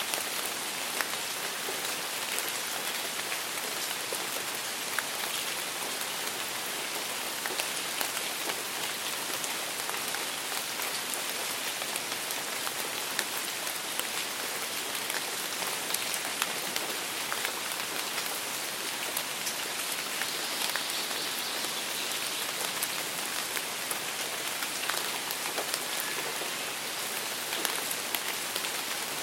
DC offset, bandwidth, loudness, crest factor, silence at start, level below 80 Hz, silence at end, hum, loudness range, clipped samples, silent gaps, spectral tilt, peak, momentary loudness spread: under 0.1%; 17 kHz; -31 LUFS; 28 dB; 0 s; -78 dBFS; 0 s; none; 1 LU; under 0.1%; none; 0.5 dB/octave; -6 dBFS; 2 LU